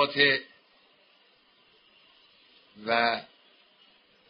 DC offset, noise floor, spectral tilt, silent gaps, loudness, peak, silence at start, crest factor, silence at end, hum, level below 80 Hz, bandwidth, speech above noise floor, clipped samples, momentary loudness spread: under 0.1%; -63 dBFS; 0 dB/octave; none; -26 LUFS; -8 dBFS; 0 s; 24 dB; 1.05 s; none; -76 dBFS; 5.4 kHz; 37 dB; under 0.1%; 13 LU